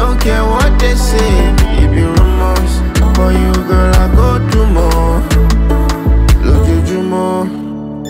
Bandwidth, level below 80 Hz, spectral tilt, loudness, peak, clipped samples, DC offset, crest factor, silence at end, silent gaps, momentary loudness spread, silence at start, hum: 16 kHz; -12 dBFS; -6.5 dB/octave; -12 LUFS; 0 dBFS; under 0.1%; under 0.1%; 8 dB; 0 s; none; 4 LU; 0 s; none